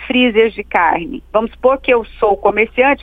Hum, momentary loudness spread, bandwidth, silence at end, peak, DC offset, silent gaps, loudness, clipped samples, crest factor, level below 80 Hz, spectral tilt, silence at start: none; 6 LU; 4.7 kHz; 0.05 s; 0 dBFS; under 0.1%; none; -14 LUFS; under 0.1%; 14 dB; -40 dBFS; -7 dB/octave; 0 s